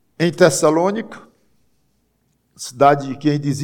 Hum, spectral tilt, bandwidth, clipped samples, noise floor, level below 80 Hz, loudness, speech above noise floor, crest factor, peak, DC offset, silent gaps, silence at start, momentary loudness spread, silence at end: none; -5 dB/octave; 17.5 kHz; under 0.1%; -65 dBFS; -62 dBFS; -16 LUFS; 48 dB; 18 dB; 0 dBFS; under 0.1%; none; 0.2 s; 19 LU; 0 s